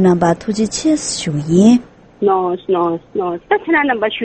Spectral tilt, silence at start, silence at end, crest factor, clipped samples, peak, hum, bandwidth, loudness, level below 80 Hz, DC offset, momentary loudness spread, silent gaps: -5.5 dB/octave; 0 s; 0 s; 14 dB; under 0.1%; 0 dBFS; none; 8.8 kHz; -15 LUFS; -48 dBFS; under 0.1%; 8 LU; none